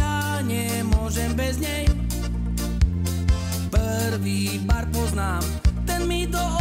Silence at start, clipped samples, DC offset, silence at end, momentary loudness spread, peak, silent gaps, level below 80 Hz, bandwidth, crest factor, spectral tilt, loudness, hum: 0 s; under 0.1%; under 0.1%; 0 s; 2 LU; -8 dBFS; none; -26 dBFS; 16.5 kHz; 16 dB; -5 dB/octave; -24 LUFS; none